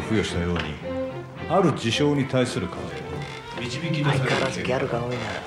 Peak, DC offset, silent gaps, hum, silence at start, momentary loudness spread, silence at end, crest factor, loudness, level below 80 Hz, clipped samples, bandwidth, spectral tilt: -8 dBFS; under 0.1%; none; none; 0 s; 11 LU; 0 s; 18 dB; -25 LUFS; -52 dBFS; under 0.1%; 12.5 kHz; -5.5 dB/octave